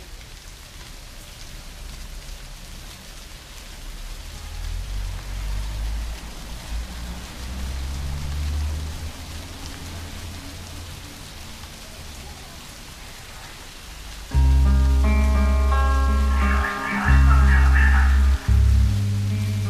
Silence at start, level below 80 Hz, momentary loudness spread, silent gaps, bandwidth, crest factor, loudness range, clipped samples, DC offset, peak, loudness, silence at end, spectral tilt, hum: 0 s; -24 dBFS; 21 LU; none; 14 kHz; 16 dB; 19 LU; under 0.1%; under 0.1%; -6 dBFS; -22 LUFS; 0 s; -5.5 dB/octave; none